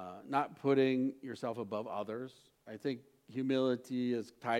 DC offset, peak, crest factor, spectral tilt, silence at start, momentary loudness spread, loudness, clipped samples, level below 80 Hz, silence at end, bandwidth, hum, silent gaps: under 0.1%; -18 dBFS; 18 dB; -7 dB/octave; 0 s; 14 LU; -36 LUFS; under 0.1%; -84 dBFS; 0 s; 12 kHz; none; none